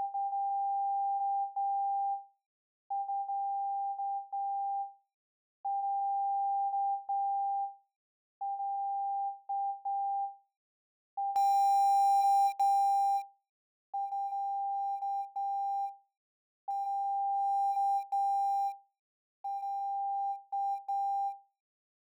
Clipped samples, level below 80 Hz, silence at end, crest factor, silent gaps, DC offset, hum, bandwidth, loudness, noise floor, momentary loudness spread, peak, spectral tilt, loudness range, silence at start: under 0.1%; under -90 dBFS; 0.65 s; 10 dB; 2.46-2.90 s, 5.14-5.64 s, 7.96-8.41 s, 10.56-11.17 s, 13.49-13.93 s, 16.17-16.68 s, 18.99-19.44 s; under 0.1%; none; 19.5 kHz; -33 LUFS; under -90 dBFS; 12 LU; -22 dBFS; 2 dB/octave; 8 LU; 0 s